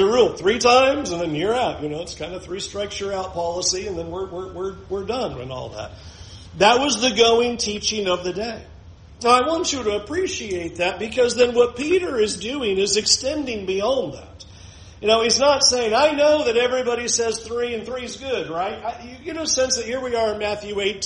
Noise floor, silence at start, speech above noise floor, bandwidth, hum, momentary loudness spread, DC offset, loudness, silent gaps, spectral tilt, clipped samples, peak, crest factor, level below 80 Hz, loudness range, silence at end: -43 dBFS; 0 s; 22 dB; 10.5 kHz; none; 15 LU; under 0.1%; -20 LUFS; none; -2.5 dB/octave; under 0.1%; -2 dBFS; 20 dB; -46 dBFS; 8 LU; 0 s